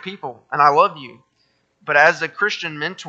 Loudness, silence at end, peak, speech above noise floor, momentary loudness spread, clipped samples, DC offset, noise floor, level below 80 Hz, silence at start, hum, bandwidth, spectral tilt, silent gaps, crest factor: -17 LUFS; 0 s; 0 dBFS; 46 dB; 19 LU; under 0.1%; under 0.1%; -65 dBFS; -72 dBFS; 0.05 s; none; 8 kHz; -3.5 dB/octave; none; 18 dB